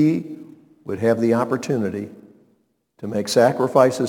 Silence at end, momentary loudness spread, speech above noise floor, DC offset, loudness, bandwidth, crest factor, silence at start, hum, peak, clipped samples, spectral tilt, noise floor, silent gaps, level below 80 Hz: 0 s; 19 LU; 46 dB; under 0.1%; -20 LUFS; 18.5 kHz; 20 dB; 0 s; none; -2 dBFS; under 0.1%; -6 dB/octave; -65 dBFS; none; -66 dBFS